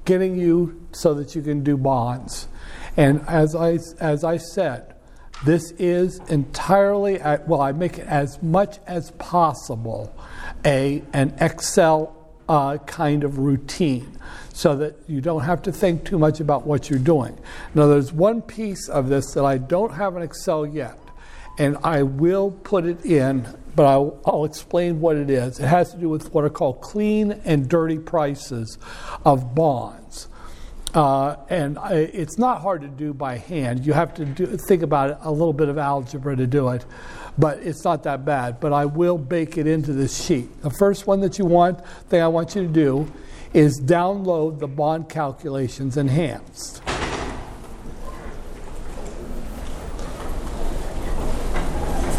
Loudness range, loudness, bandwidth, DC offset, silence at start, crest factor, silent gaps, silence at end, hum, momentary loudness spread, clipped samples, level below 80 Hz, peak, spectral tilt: 4 LU; -21 LUFS; 15 kHz; under 0.1%; 0 s; 18 dB; none; 0 s; none; 16 LU; under 0.1%; -36 dBFS; -2 dBFS; -6.5 dB/octave